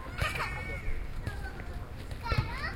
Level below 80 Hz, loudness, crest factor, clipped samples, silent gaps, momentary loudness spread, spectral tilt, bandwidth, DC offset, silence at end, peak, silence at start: -38 dBFS; -36 LUFS; 20 dB; under 0.1%; none; 10 LU; -5 dB/octave; 16.5 kHz; under 0.1%; 0 s; -16 dBFS; 0 s